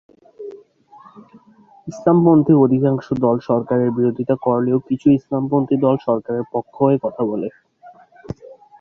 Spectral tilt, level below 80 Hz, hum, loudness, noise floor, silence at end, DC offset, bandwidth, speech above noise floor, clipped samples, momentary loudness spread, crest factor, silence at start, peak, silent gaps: -10 dB/octave; -56 dBFS; none; -17 LUFS; -50 dBFS; 0.25 s; under 0.1%; 6.8 kHz; 33 dB; under 0.1%; 22 LU; 16 dB; 0.4 s; -2 dBFS; none